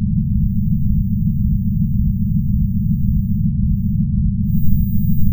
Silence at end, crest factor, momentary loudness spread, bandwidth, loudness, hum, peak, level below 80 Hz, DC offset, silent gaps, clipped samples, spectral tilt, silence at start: 0 s; 14 dB; 1 LU; 16 kHz; -18 LUFS; none; 0 dBFS; -22 dBFS; under 0.1%; none; under 0.1%; -18 dB/octave; 0 s